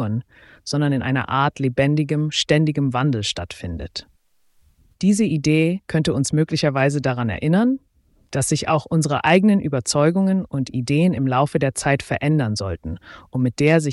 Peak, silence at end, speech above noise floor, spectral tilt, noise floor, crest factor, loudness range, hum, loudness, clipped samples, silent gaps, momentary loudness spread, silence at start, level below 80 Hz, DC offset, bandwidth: -4 dBFS; 0 s; 42 dB; -5.5 dB/octave; -61 dBFS; 16 dB; 3 LU; none; -20 LUFS; under 0.1%; none; 11 LU; 0 s; -46 dBFS; under 0.1%; 12 kHz